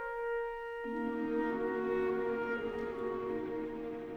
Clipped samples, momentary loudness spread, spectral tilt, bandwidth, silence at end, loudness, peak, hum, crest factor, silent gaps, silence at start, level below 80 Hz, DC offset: under 0.1%; 6 LU; -7.5 dB/octave; 6.8 kHz; 0 s; -37 LUFS; -24 dBFS; none; 12 dB; none; 0 s; -60 dBFS; under 0.1%